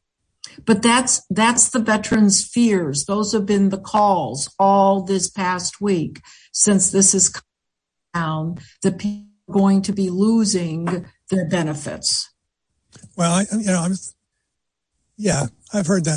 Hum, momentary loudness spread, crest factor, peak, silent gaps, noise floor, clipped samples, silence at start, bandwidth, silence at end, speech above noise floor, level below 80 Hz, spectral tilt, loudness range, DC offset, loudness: none; 12 LU; 18 dB; -2 dBFS; none; -80 dBFS; under 0.1%; 0.45 s; 10.5 kHz; 0 s; 62 dB; -54 dBFS; -4 dB/octave; 6 LU; under 0.1%; -18 LUFS